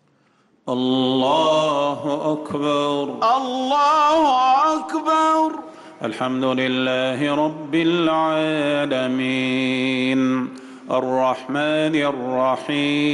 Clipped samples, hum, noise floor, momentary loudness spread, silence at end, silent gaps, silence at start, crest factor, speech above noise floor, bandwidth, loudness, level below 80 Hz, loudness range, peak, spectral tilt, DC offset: under 0.1%; none; -60 dBFS; 8 LU; 0 s; none; 0.65 s; 10 dB; 41 dB; 11.5 kHz; -20 LUFS; -64 dBFS; 3 LU; -10 dBFS; -5 dB/octave; under 0.1%